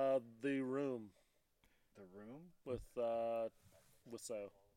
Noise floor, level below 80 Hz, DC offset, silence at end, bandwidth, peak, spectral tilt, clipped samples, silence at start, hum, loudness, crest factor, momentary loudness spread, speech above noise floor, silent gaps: -77 dBFS; -70 dBFS; under 0.1%; 0.3 s; 16.5 kHz; -28 dBFS; -5.5 dB/octave; under 0.1%; 0 s; none; -43 LUFS; 18 dB; 18 LU; 33 dB; none